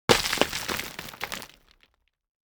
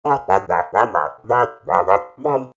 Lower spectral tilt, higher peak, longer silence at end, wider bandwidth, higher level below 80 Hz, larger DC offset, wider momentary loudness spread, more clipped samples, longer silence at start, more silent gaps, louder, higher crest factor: second, -2.5 dB/octave vs -6.5 dB/octave; about the same, 0 dBFS vs 0 dBFS; first, 1.1 s vs 0.1 s; first, over 20 kHz vs 7.8 kHz; about the same, -52 dBFS vs -56 dBFS; neither; first, 16 LU vs 5 LU; neither; about the same, 0.1 s vs 0.05 s; neither; second, -27 LUFS vs -18 LUFS; first, 30 dB vs 18 dB